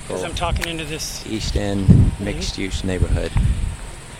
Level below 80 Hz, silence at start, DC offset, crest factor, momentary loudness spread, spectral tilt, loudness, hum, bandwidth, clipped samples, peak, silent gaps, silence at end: -26 dBFS; 0 s; under 0.1%; 20 dB; 11 LU; -5.5 dB/octave; -21 LUFS; none; 16 kHz; under 0.1%; 0 dBFS; none; 0 s